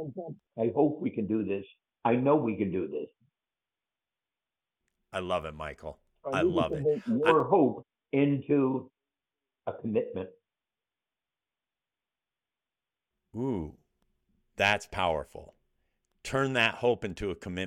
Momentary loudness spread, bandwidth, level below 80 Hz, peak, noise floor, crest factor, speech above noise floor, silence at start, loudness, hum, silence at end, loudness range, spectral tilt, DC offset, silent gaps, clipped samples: 18 LU; 13 kHz; -58 dBFS; -8 dBFS; under -90 dBFS; 24 dB; over 61 dB; 0 s; -29 LUFS; none; 0 s; 13 LU; -6 dB/octave; under 0.1%; none; under 0.1%